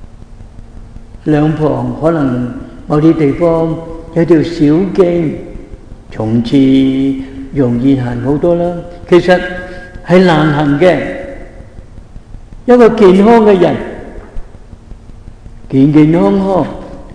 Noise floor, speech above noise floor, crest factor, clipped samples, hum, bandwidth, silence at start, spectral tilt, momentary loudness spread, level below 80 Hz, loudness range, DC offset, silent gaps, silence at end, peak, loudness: -32 dBFS; 23 dB; 12 dB; 1%; none; 10.5 kHz; 0 s; -8 dB/octave; 18 LU; -32 dBFS; 3 LU; 0.2%; none; 0 s; 0 dBFS; -10 LUFS